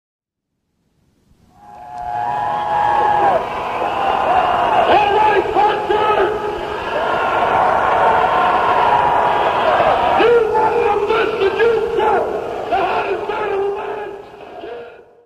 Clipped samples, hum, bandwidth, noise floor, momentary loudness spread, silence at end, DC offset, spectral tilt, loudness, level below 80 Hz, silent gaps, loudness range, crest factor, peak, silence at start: under 0.1%; none; 13.5 kHz; -75 dBFS; 11 LU; 0.3 s; under 0.1%; -5 dB/octave; -16 LUFS; -44 dBFS; none; 6 LU; 14 dB; -2 dBFS; 1.65 s